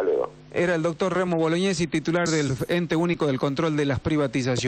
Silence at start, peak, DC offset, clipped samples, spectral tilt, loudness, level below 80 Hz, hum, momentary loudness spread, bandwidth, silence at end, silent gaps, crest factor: 0 s; -12 dBFS; under 0.1%; under 0.1%; -5.5 dB/octave; -24 LUFS; -52 dBFS; none; 2 LU; 14 kHz; 0 s; none; 10 dB